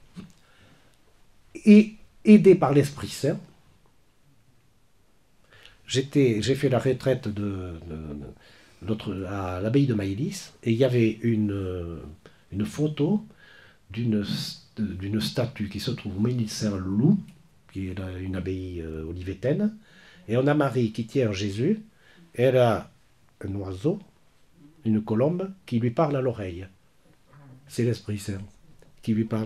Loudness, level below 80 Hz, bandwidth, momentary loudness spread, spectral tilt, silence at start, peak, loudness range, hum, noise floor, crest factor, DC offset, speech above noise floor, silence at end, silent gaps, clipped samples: -25 LUFS; -58 dBFS; 13 kHz; 15 LU; -7 dB/octave; 0.15 s; -4 dBFS; 9 LU; none; -64 dBFS; 22 dB; under 0.1%; 40 dB; 0 s; none; under 0.1%